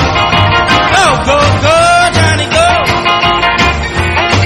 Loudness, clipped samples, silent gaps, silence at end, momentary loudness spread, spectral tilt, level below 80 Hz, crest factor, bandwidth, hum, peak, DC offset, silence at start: -8 LUFS; 0.7%; none; 0 s; 3 LU; -4 dB/octave; -24 dBFS; 8 dB; 13 kHz; none; 0 dBFS; under 0.1%; 0 s